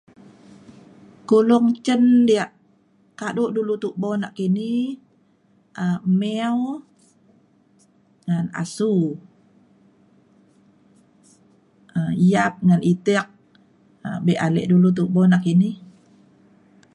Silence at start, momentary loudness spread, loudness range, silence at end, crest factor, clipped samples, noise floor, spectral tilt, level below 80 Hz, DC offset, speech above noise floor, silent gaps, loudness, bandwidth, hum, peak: 1.3 s; 15 LU; 8 LU; 1.05 s; 18 dB; under 0.1%; -59 dBFS; -7.5 dB/octave; -64 dBFS; under 0.1%; 41 dB; none; -20 LUFS; 11.5 kHz; none; -4 dBFS